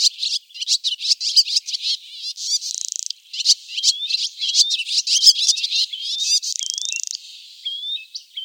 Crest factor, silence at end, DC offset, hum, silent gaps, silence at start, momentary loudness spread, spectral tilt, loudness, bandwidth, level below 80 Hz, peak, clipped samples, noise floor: 22 dB; 0 s; under 0.1%; none; none; 0 s; 14 LU; 11.5 dB/octave; -18 LUFS; 17 kHz; under -90 dBFS; 0 dBFS; under 0.1%; -40 dBFS